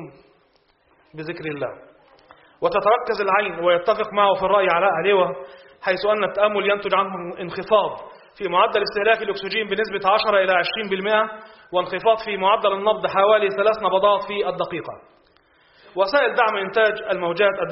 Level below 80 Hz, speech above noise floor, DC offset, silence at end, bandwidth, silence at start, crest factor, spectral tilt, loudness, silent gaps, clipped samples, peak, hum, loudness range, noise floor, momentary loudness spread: -60 dBFS; 41 dB; under 0.1%; 0 s; 5.8 kHz; 0 s; 18 dB; -1.5 dB/octave; -20 LUFS; none; under 0.1%; -2 dBFS; none; 3 LU; -61 dBFS; 12 LU